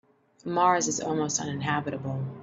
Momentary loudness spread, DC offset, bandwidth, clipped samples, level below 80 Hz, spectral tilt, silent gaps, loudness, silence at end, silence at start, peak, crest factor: 10 LU; under 0.1%; 8 kHz; under 0.1%; -68 dBFS; -4 dB/octave; none; -27 LUFS; 0 s; 0.45 s; -10 dBFS; 20 dB